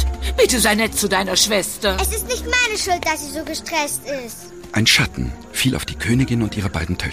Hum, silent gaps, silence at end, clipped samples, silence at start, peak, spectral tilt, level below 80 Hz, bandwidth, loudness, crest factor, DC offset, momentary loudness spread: none; none; 0 s; under 0.1%; 0 s; 0 dBFS; -3 dB/octave; -32 dBFS; 15.5 kHz; -18 LUFS; 20 dB; 0.4%; 11 LU